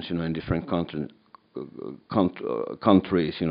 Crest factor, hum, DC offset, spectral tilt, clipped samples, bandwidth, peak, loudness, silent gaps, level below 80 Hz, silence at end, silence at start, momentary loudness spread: 22 dB; none; under 0.1%; -6.5 dB/octave; under 0.1%; 5.2 kHz; -4 dBFS; -26 LUFS; none; -50 dBFS; 0 s; 0 s; 18 LU